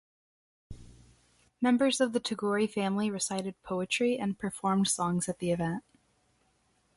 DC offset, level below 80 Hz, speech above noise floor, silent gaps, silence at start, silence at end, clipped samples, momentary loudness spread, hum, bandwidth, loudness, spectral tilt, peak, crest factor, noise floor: under 0.1%; -62 dBFS; 41 dB; none; 0.7 s; 1.15 s; under 0.1%; 8 LU; none; 11.5 kHz; -30 LUFS; -4.5 dB/octave; -14 dBFS; 18 dB; -71 dBFS